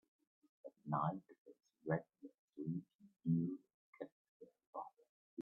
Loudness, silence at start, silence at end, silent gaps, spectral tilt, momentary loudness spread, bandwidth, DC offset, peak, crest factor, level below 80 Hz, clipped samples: -45 LUFS; 0.65 s; 0 s; 1.38-1.45 s, 2.39-2.48 s, 2.95-2.99 s, 3.74-3.93 s, 4.12-4.40 s, 4.67-4.73 s, 5.09-5.37 s; -6.5 dB/octave; 24 LU; 3.9 kHz; under 0.1%; -24 dBFS; 22 dB; -84 dBFS; under 0.1%